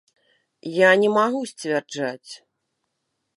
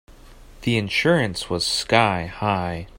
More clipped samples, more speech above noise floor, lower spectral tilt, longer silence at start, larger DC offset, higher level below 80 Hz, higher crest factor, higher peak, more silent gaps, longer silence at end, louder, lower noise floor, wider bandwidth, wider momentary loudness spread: neither; first, 56 dB vs 23 dB; about the same, -4.5 dB/octave vs -4.5 dB/octave; first, 0.65 s vs 0.1 s; neither; second, -80 dBFS vs -46 dBFS; about the same, 20 dB vs 20 dB; about the same, -4 dBFS vs -2 dBFS; neither; first, 1 s vs 0 s; about the same, -21 LUFS vs -21 LUFS; first, -77 dBFS vs -45 dBFS; second, 11.5 kHz vs 16.5 kHz; first, 23 LU vs 6 LU